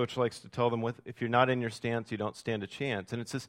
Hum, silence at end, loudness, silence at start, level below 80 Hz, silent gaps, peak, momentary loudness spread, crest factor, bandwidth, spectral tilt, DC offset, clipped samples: none; 0 s; -32 LUFS; 0 s; -68 dBFS; none; -10 dBFS; 9 LU; 22 dB; 15 kHz; -6 dB/octave; under 0.1%; under 0.1%